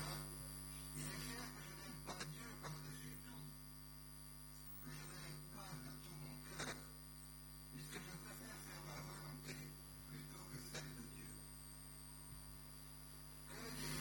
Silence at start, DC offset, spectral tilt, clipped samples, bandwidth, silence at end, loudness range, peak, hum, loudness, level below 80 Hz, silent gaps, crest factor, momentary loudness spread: 0 s; under 0.1%; -3.5 dB/octave; under 0.1%; 17.5 kHz; 0 s; 3 LU; -34 dBFS; 50 Hz at -60 dBFS; -52 LUFS; -62 dBFS; none; 20 dB; 7 LU